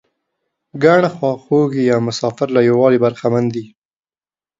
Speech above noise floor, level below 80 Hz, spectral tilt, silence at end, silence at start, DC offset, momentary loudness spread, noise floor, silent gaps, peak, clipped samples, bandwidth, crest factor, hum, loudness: over 76 dB; -60 dBFS; -7 dB/octave; 0.95 s; 0.75 s; under 0.1%; 9 LU; under -90 dBFS; none; 0 dBFS; under 0.1%; 7.8 kHz; 16 dB; none; -15 LUFS